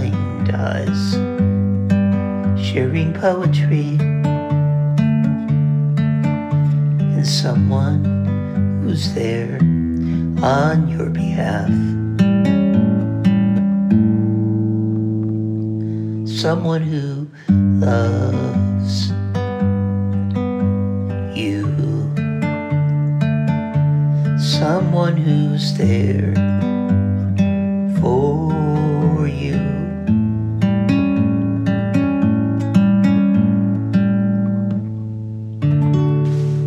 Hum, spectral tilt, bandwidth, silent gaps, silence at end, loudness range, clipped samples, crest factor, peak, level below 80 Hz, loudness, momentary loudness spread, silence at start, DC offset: none; -8 dB/octave; 9.6 kHz; none; 0 s; 3 LU; under 0.1%; 14 dB; -2 dBFS; -44 dBFS; -18 LUFS; 5 LU; 0 s; under 0.1%